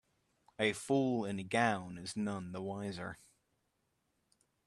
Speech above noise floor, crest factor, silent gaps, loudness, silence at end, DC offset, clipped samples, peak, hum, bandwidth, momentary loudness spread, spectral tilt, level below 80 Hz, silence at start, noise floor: 45 dB; 22 dB; none; -36 LUFS; 1.5 s; under 0.1%; under 0.1%; -16 dBFS; none; 13 kHz; 11 LU; -5 dB/octave; -74 dBFS; 0.6 s; -81 dBFS